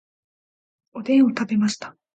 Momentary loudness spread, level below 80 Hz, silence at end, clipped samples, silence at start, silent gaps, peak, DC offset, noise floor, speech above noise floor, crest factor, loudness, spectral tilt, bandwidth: 16 LU; -68 dBFS; 0.25 s; under 0.1%; 0.95 s; none; -8 dBFS; under 0.1%; under -90 dBFS; over 70 dB; 14 dB; -20 LUFS; -5.5 dB/octave; 9 kHz